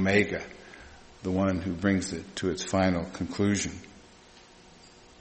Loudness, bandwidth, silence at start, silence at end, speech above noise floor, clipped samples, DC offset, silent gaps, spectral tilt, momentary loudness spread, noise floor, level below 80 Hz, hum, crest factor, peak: -29 LUFS; 8.8 kHz; 0 s; 0.35 s; 26 dB; under 0.1%; under 0.1%; none; -5 dB/octave; 21 LU; -54 dBFS; -54 dBFS; none; 22 dB; -8 dBFS